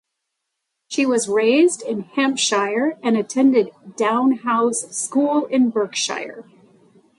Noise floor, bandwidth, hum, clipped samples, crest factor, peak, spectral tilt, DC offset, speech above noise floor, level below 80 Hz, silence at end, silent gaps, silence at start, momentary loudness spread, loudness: -78 dBFS; 11.5 kHz; none; under 0.1%; 14 dB; -6 dBFS; -3 dB/octave; under 0.1%; 59 dB; -74 dBFS; 0.75 s; none; 0.9 s; 8 LU; -19 LUFS